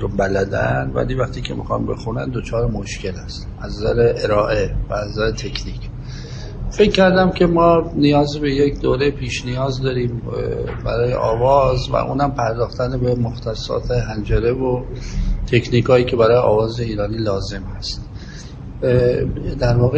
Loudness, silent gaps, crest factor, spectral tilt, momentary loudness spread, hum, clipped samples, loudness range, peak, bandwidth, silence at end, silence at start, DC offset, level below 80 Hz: -18 LUFS; none; 18 dB; -6.5 dB/octave; 14 LU; none; under 0.1%; 5 LU; 0 dBFS; 8.6 kHz; 0 s; 0 s; under 0.1%; -30 dBFS